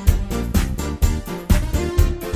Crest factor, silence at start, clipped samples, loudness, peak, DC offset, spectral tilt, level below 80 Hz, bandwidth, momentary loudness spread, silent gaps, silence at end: 18 dB; 0 s; under 0.1%; -22 LUFS; -2 dBFS; under 0.1%; -6 dB/octave; -20 dBFS; 16 kHz; 4 LU; none; 0 s